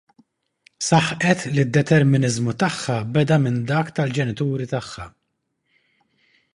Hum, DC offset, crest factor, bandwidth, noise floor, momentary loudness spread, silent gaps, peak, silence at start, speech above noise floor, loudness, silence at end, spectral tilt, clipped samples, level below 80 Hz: none; under 0.1%; 20 dB; 11.5 kHz; -74 dBFS; 11 LU; none; 0 dBFS; 0.8 s; 54 dB; -20 LUFS; 1.45 s; -5.5 dB/octave; under 0.1%; -52 dBFS